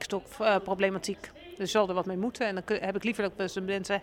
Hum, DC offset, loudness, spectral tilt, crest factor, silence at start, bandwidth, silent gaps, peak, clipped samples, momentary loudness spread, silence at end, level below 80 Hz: none; under 0.1%; -30 LUFS; -4.5 dB/octave; 18 dB; 0 s; 16.5 kHz; none; -12 dBFS; under 0.1%; 9 LU; 0 s; -60 dBFS